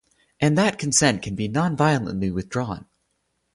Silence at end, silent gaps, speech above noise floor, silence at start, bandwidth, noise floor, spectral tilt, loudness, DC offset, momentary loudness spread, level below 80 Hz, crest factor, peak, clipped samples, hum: 0.7 s; none; 51 dB; 0.4 s; 11.5 kHz; -72 dBFS; -4.5 dB/octave; -22 LUFS; under 0.1%; 9 LU; -50 dBFS; 20 dB; -4 dBFS; under 0.1%; none